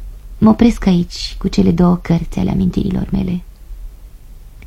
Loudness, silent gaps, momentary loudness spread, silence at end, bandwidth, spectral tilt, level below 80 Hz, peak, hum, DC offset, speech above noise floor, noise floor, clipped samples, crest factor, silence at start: -15 LUFS; none; 10 LU; 0 s; 11.5 kHz; -7.5 dB/octave; -28 dBFS; 0 dBFS; none; under 0.1%; 22 dB; -35 dBFS; under 0.1%; 16 dB; 0 s